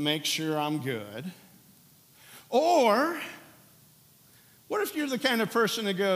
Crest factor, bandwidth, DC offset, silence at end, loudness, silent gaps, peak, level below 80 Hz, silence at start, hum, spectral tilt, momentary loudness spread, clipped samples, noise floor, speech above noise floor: 20 dB; 16 kHz; under 0.1%; 0 s; -27 LUFS; none; -10 dBFS; -82 dBFS; 0 s; none; -4 dB/octave; 18 LU; under 0.1%; -58 dBFS; 31 dB